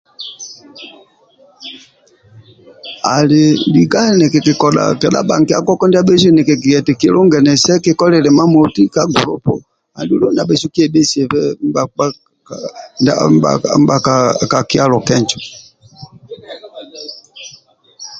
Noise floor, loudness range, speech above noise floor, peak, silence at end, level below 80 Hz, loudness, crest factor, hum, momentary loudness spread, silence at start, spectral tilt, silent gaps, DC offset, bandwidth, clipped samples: -49 dBFS; 7 LU; 37 dB; 0 dBFS; 0 s; -50 dBFS; -12 LUFS; 12 dB; none; 22 LU; 0.2 s; -5.5 dB/octave; none; under 0.1%; 9 kHz; under 0.1%